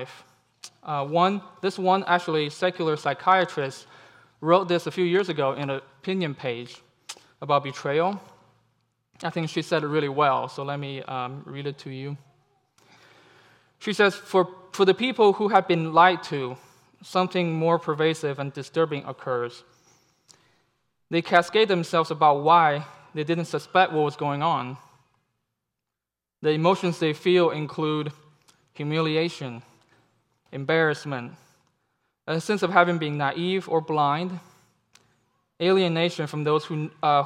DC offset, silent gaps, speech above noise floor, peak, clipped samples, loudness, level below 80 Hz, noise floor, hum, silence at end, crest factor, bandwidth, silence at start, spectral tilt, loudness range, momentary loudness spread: under 0.1%; none; 64 dB; -2 dBFS; under 0.1%; -24 LUFS; -80 dBFS; -88 dBFS; none; 0 s; 22 dB; 13.5 kHz; 0 s; -6 dB/octave; 7 LU; 15 LU